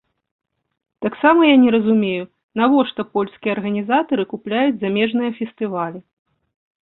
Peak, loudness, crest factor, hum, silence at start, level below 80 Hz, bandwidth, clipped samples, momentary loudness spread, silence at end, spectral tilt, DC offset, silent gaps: -2 dBFS; -18 LUFS; 18 dB; none; 1 s; -64 dBFS; 4.1 kHz; under 0.1%; 13 LU; 0.85 s; -10.5 dB/octave; under 0.1%; 2.43-2.49 s